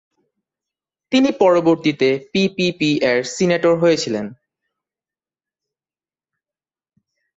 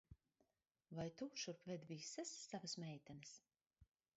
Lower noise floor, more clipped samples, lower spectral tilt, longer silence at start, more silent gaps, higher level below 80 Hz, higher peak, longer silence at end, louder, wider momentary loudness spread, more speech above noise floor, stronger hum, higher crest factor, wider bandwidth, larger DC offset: about the same, under -90 dBFS vs -87 dBFS; neither; about the same, -5 dB/octave vs -4.5 dB/octave; first, 1.1 s vs 0.1 s; neither; first, -60 dBFS vs -80 dBFS; first, -2 dBFS vs -36 dBFS; first, 3.05 s vs 0.35 s; first, -17 LUFS vs -52 LUFS; second, 6 LU vs 9 LU; first, over 74 dB vs 35 dB; neither; about the same, 18 dB vs 18 dB; about the same, 8 kHz vs 8 kHz; neither